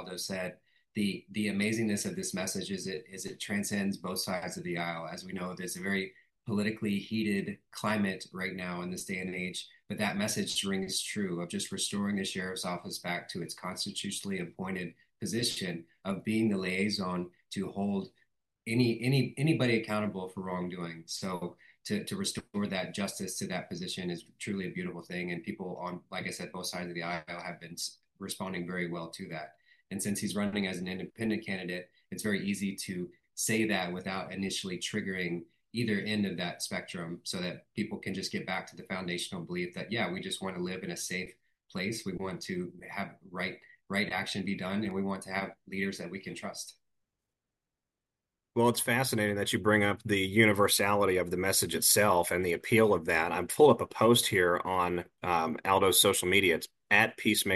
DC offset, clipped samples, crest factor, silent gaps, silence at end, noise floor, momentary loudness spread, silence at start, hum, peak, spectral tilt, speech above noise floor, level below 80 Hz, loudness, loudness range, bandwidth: under 0.1%; under 0.1%; 24 dB; none; 0 s; -89 dBFS; 14 LU; 0 s; none; -10 dBFS; -4 dB/octave; 57 dB; -68 dBFS; -32 LUFS; 11 LU; 12.5 kHz